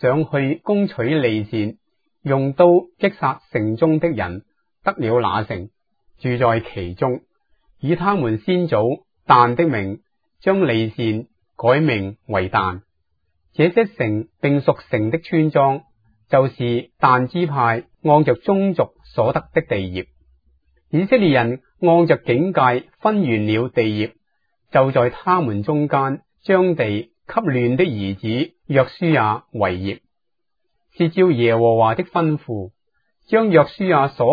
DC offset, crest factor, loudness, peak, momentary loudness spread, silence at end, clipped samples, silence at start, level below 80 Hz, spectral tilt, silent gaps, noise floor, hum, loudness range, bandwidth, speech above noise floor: under 0.1%; 18 dB; -19 LUFS; 0 dBFS; 10 LU; 0 s; under 0.1%; 0 s; -54 dBFS; -10 dB/octave; none; -81 dBFS; none; 3 LU; 5 kHz; 63 dB